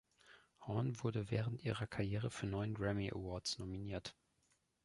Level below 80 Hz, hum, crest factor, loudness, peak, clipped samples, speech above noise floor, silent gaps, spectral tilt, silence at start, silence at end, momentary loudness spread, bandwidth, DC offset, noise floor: -62 dBFS; none; 18 dB; -42 LUFS; -24 dBFS; under 0.1%; 39 dB; none; -6 dB/octave; 0.25 s; 0.7 s; 6 LU; 11.5 kHz; under 0.1%; -80 dBFS